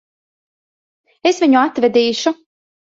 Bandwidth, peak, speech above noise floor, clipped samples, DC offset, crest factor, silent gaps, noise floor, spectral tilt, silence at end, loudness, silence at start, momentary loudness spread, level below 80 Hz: 7.8 kHz; -2 dBFS; over 76 dB; under 0.1%; under 0.1%; 16 dB; none; under -90 dBFS; -3.5 dB/octave; 0.65 s; -15 LUFS; 1.25 s; 8 LU; -66 dBFS